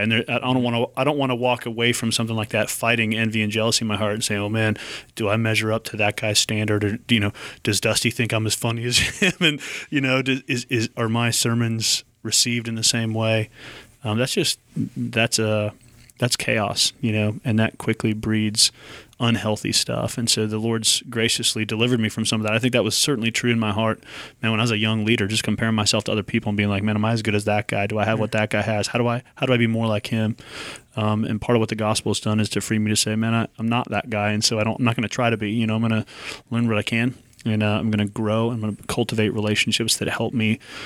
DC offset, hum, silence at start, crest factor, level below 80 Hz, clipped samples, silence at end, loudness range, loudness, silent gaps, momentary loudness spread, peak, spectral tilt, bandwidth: under 0.1%; none; 0 s; 18 dB; -54 dBFS; under 0.1%; 0 s; 2 LU; -21 LUFS; none; 6 LU; -4 dBFS; -4 dB/octave; 16 kHz